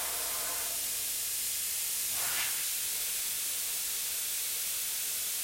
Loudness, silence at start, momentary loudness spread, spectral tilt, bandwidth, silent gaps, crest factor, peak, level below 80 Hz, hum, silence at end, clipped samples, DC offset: -31 LUFS; 0 s; 2 LU; 2 dB/octave; 16.5 kHz; none; 16 dB; -18 dBFS; -66 dBFS; none; 0 s; under 0.1%; under 0.1%